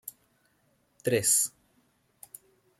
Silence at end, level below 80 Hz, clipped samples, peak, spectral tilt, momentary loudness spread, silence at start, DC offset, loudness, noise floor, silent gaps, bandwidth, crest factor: 1.3 s; -74 dBFS; under 0.1%; -10 dBFS; -2.5 dB/octave; 26 LU; 0.05 s; under 0.1%; -26 LUFS; -70 dBFS; none; 16 kHz; 22 dB